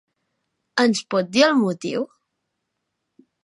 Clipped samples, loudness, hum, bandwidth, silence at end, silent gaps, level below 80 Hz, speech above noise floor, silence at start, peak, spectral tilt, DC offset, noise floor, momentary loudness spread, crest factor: under 0.1%; -20 LUFS; none; 11.5 kHz; 1.4 s; none; -72 dBFS; 58 dB; 0.75 s; -2 dBFS; -4 dB/octave; under 0.1%; -78 dBFS; 11 LU; 20 dB